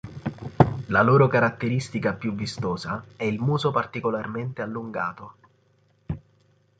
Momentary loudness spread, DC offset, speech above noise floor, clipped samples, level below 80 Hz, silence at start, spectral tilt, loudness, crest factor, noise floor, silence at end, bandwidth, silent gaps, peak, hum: 16 LU; under 0.1%; 39 dB; under 0.1%; -50 dBFS; 0.05 s; -7 dB/octave; -24 LUFS; 24 dB; -63 dBFS; 0.6 s; 9.2 kHz; none; -2 dBFS; none